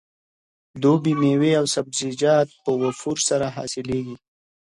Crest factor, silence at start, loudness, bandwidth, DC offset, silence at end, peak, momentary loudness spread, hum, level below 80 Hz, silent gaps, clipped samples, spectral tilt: 16 dB; 0.75 s; -21 LUFS; 11.5 kHz; under 0.1%; 0.6 s; -6 dBFS; 9 LU; none; -58 dBFS; none; under 0.1%; -5 dB/octave